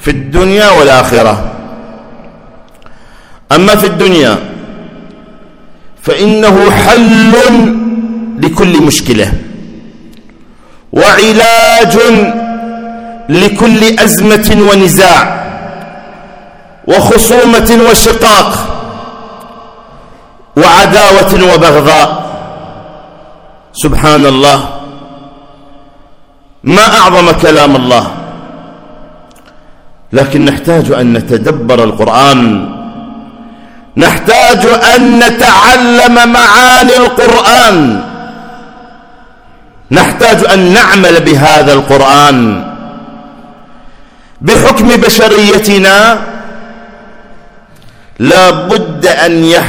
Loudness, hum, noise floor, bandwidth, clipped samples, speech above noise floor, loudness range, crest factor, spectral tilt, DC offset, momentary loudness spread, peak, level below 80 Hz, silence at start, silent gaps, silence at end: -5 LUFS; none; -37 dBFS; over 20 kHz; 9%; 33 dB; 6 LU; 8 dB; -4 dB/octave; under 0.1%; 19 LU; 0 dBFS; -26 dBFS; 0 s; none; 0 s